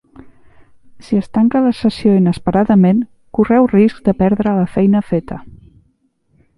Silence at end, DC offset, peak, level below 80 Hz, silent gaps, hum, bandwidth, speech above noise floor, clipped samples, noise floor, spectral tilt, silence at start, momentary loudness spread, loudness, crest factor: 1.1 s; under 0.1%; 0 dBFS; -42 dBFS; none; none; 11 kHz; 47 dB; under 0.1%; -60 dBFS; -9 dB/octave; 1 s; 9 LU; -14 LUFS; 14 dB